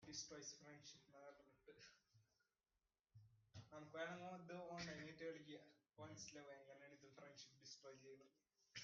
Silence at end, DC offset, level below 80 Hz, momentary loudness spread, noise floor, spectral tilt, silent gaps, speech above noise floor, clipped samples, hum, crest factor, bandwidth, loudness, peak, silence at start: 0 s; under 0.1%; -86 dBFS; 13 LU; under -90 dBFS; -3 dB/octave; none; over 32 dB; under 0.1%; none; 20 dB; 7.2 kHz; -58 LUFS; -38 dBFS; 0 s